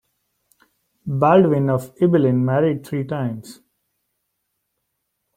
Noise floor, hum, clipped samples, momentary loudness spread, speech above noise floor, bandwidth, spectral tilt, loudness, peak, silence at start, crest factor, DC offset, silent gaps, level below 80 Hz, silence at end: -75 dBFS; none; under 0.1%; 13 LU; 58 dB; 15.5 kHz; -8.5 dB/octave; -19 LUFS; -2 dBFS; 1.05 s; 20 dB; under 0.1%; none; -58 dBFS; 1.85 s